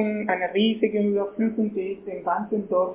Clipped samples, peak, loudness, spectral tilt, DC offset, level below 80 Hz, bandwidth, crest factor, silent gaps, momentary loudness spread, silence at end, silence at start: under 0.1%; -10 dBFS; -25 LUFS; -10 dB/octave; under 0.1%; -64 dBFS; 3.8 kHz; 14 dB; none; 7 LU; 0 s; 0 s